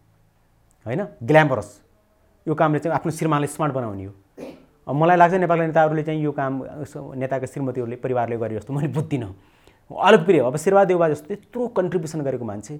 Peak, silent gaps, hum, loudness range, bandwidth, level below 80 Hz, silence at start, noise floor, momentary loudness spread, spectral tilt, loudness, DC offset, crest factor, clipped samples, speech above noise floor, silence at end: 0 dBFS; none; none; 6 LU; 15.5 kHz; -60 dBFS; 0.85 s; -59 dBFS; 18 LU; -6.5 dB/octave; -21 LUFS; under 0.1%; 22 dB; under 0.1%; 39 dB; 0 s